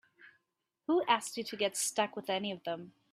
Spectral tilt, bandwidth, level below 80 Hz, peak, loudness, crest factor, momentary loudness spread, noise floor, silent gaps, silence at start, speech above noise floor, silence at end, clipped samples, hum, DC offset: -2.5 dB/octave; 15.5 kHz; -84 dBFS; -12 dBFS; -34 LUFS; 24 dB; 11 LU; -85 dBFS; none; 0.2 s; 51 dB; 0.2 s; under 0.1%; none; under 0.1%